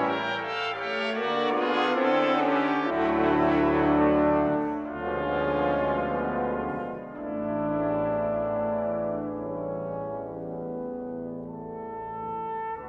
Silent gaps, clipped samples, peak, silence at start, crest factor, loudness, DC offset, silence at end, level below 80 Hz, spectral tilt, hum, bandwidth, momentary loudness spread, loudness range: none; under 0.1%; -10 dBFS; 0 s; 16 dB; -27 LUFS; under 0.1%; 0 s; -50 dBFS; -7 dB/octave; none; 7.4 kHz; 12 LU; 10 LU